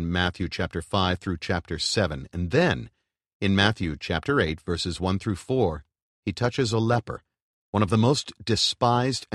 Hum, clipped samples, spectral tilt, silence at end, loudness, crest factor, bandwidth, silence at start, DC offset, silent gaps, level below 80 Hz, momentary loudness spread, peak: none; under 0.1%; -5 dB/octave; 0 s; -25 LUFS; 22 dB; 12 kHz; 0 s; under 0.1%; 3.33-3.40 s, 6.02-6.23 s, 7.42-7.73 s; -46 dBFS; 9 LU; -4 dBFS